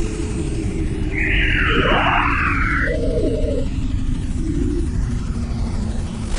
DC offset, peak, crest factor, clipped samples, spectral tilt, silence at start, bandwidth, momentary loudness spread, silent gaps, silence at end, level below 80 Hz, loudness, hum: under 0.1%; -2 dBFS; 16 dB; under 0.1%; -6 dB/octave; 0 s; 10 kHz; 9 LU; none; 0 s; -22 dBFS; -20 LUFS; none